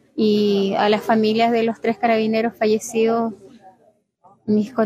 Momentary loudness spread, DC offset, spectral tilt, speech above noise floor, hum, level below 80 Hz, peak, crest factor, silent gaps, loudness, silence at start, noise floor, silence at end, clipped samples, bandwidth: 5 LU; under 0.1%; -5.5 dB/octave; 40 dB; none; -66 dBFS; -4 dBFS; 16 dB; none; -19 LUFS; 0.15 s; -58 dBFS; 0 s; under 0.1%; 14.5 kHz